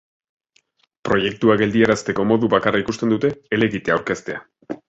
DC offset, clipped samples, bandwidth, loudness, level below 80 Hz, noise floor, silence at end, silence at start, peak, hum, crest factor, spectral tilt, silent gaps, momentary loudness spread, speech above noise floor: under 0.1%; under 0.1%; 8 kHz; -19 LUFS; -52 dBFS; -62 dBFS; 0.15 s; 1.05 s; -2 dBFS; none; 18 dB; -6 dB/octave; none; 12 LU; 44 dB